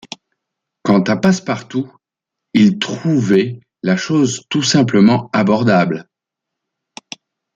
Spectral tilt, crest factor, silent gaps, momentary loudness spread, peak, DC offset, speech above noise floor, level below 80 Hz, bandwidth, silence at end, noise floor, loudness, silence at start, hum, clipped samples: -5.5 dB/octave; 14 dB; none; 19 LU; -2 dBFS; under 0.1%; 68 dB; -56 dBFS; 9.2 kHz; 1.55 s; -82 dBFS; -15 LUFS; 0.85 s; none; under 0.1%